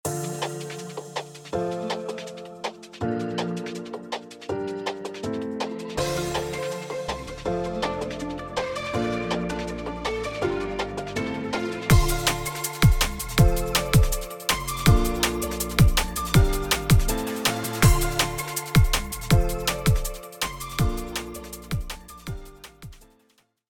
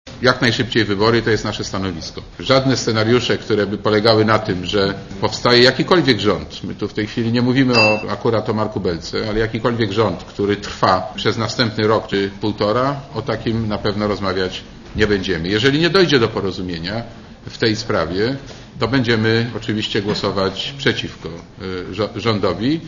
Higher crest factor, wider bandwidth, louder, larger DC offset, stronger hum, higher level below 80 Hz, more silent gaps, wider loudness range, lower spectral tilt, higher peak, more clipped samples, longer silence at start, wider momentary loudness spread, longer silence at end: about the same, 20 dB vs 18 dB; first, over 20 kHz vs 8.4 kHz; second, -25 LUFS vs -18 LUFS; neither; neither; first, -30 dBFS vs -42 dBFS; neither; first, 9 LU vs 5 LU; about the same, -4.5 dB/octave vs -5.5 dB/octave; second, -4 dBFS vs 0 dBFS; neither; about the same, 0.05 s vs 0.05 s; first, 14 LU vs 11 LU; first, 0.7 s vs 0 s